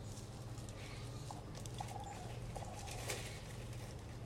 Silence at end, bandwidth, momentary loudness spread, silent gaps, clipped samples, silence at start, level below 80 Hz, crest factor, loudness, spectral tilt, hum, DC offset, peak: 0 s; 16 kHz; 6 LU; none; under 0.1%; 0 s; -56 dBFS; 20 dB; -48 LUFS; -4.5 dB/octave; none; under 0.1%; -28 dBFS